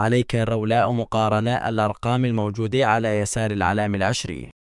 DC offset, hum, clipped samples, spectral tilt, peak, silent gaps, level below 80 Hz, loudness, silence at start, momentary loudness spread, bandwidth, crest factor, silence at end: under 0.1%; none; under 0.1%; -5.5 dB/octave; -4 dBFS; none; -48 dBFS; -22 LUFS; 0 s; 4 LU; 12 kHz; 18 dB; 0.2 s